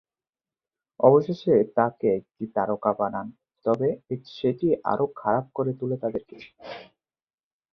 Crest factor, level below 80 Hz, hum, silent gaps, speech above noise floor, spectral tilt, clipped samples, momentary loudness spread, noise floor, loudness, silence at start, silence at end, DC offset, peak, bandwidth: 22 dB; -66 dBFS; none; none; over 66 dB; -9.5 dB/octave; under 0.1%; 15 LU; under -90 dBFS; -25 LUFS; 1 s; 0.9 s; under 0.1%; -4 dBFS; 6.2 kHz